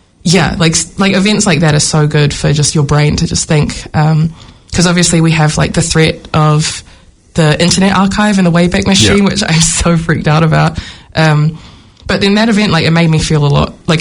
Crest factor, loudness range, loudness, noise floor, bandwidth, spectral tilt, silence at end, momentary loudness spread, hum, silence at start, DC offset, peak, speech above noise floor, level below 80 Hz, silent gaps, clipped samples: 10 dB; 2 LU; -10 LUFS; -40 dBFS; 11 kHz; -4.5 dB/octave; 0 s; 5 LU; none; 0.25 s; under 0.1%; 0 dBFS; 31 dB; -30 dBFS; none; 0.2%